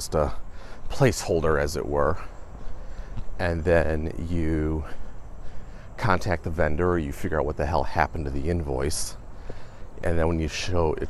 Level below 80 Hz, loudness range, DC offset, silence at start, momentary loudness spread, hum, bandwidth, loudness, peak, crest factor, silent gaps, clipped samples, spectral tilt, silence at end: -36 dBFS; 2 LU; under 0.1%; 0 s; 21 LU; none; 13 kHz; -26 LUFS; -4 dBFS; 20 dB; none; under 0.1%; -5.5 dB/octave; 0 s